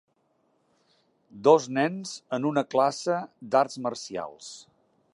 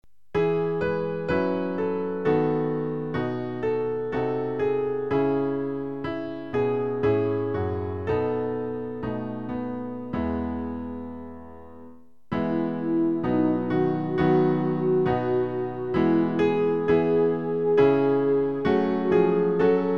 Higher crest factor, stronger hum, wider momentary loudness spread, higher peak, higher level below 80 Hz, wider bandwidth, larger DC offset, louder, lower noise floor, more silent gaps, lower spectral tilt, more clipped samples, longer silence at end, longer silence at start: first, 22 dB vs 16 dB; neither; first, 17 LU vs 10 LU; about the same, -6 dBFS vs -8 dBFS; second, -78 dBFS vs -52 dBFS; first, 11 kHz vs 5.8 kHz; second, under 0.1% vs 0.5%; about the same, -26 LUFS vs -25 LUFS; first, -70 dBFS vs -50 dBFS; neither; second, -5 dB/octave vs -9.5 dB/octave; neither; first, 0.55 s vs 0 s; first, 1.35 s vs 0.35 s